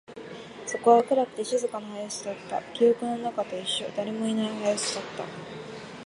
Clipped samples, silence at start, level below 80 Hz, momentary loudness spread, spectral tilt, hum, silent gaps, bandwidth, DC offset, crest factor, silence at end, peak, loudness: under 0.1%; 0.1 s; -70 dBFS; 19 LU; -3.5 dB/octave; none; none; 11.5 kHz; under 0.1%; 22 dB; 0 s; -6 dBFS; -27 LUFS